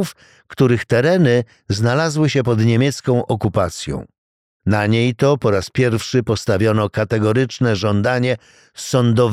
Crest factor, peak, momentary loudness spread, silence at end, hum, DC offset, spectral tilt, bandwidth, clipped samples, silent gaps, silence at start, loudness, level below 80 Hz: 14 dB; -2 dBFS; 8 LU; 0 s; none; 0.1%; -6.5 dB/octave; 14.5 kHz; under 0.1%; 4.18-4.60 s; 0 s; -17 LUFS; -46 dBFS